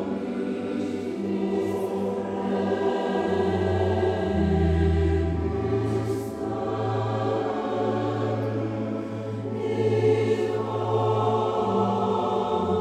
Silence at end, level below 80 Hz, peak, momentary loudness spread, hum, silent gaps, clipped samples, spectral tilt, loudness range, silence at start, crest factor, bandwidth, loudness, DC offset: 0 s; -40 dBFS; -10 dBFS; 7 LU; none; none; under 0.1%; -8 dB/octave; 3 LU; 0 s; 14 dB; 13 kHz; -26 LUFS; under 0.1%